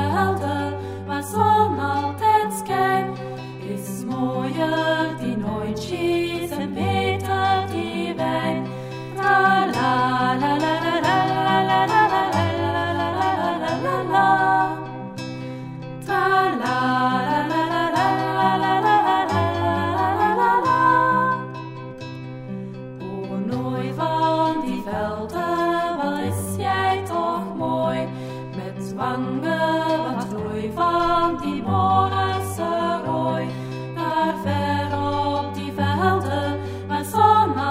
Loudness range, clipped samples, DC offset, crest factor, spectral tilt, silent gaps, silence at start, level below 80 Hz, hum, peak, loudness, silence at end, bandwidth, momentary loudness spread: 5 LU; under 0.1%; under 0.1%; 18 dB; -6 dB/octave; none; 0 s; -54 dBFS; none; -4 dBFS; -21 LUFS; 0 s; 16 kHz; 13 LU